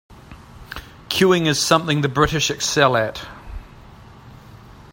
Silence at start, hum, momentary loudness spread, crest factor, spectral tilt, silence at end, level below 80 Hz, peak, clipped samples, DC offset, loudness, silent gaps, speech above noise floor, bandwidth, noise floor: 0.1 s; none; 20 LU; 22 dB; -4 dB/octave; 0.2 s; -42 dBFS; 0 dBFS; under 0.1%; under 0.1%; -18 LUFS; none; 25 dB; 16.5 kHz; -43 dBFS